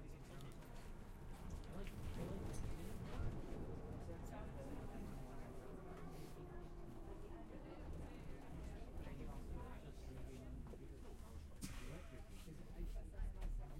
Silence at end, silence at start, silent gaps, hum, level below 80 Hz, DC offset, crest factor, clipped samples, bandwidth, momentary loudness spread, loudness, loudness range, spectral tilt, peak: 0 s; 0 s; none; none; -52 dBFS; under 0.1%; 16 dB; under 0.1%; 16 kHz; 8 LU; -54 LUFS; 4 LU; -6.5 dB/octave; -34 dBFS